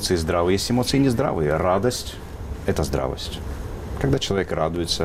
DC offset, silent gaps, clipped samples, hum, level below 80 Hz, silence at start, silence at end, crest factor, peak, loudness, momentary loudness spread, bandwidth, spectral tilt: under 0.1%; none; under 0.1%; none; -36 dBFS; 0 s; 0 s; 14 dB; -8 dBFS; -23 LUFS; 13 LU; 16 kHz; -5 dB/octave